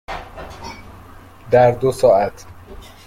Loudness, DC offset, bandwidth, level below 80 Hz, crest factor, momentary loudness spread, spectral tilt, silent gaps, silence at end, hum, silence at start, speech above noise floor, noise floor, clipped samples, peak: -15 LUFS; under 0.1%; 15.5 kHz; -42 dBFS; 18 dB; 21 LU; -6.5 dB/octave; none; 0.3 s; none; 0.1 s; 26 dB; -41 dBFS; under 0.1%; -2 dBFS